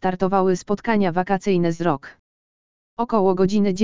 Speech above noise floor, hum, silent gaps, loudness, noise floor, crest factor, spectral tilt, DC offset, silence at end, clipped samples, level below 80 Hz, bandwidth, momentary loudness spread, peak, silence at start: over 70 dB; none; 2.19-2.97 s; -21 LUFS; under -90 dBFS; 16 dB; -7 dB/octave; 2%; 0 s; under 0.1%; -52 dBFS; 7.6 kHz; 6 LU; -4 dBFS; 0 s